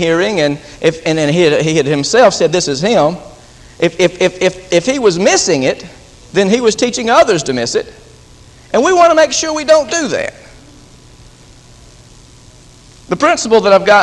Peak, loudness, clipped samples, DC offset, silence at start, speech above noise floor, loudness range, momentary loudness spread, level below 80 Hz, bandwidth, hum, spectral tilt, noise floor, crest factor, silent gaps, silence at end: 0 dBFS; -12 LUFS; 0.1%; under 0.1%; 0 s; 29 dB; 6 LU; 8 LU; -44 dBFS; 11.5 kHz; none; -4 dB/octave; -40 dBFS; 12 dB; none; 0 s